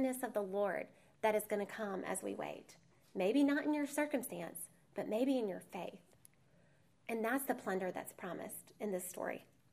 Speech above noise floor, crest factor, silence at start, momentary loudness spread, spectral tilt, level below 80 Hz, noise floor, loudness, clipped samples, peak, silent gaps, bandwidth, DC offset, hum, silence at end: 32 dB; 18 dB; 0 s; 12 LU; -4.5 dB/octave; -84 dBFS; -71 dBFS; -39 LUFS; under 0.1%; -22 dBFS; none; 15.5 kHz; under 0.1%; none; 0.3 s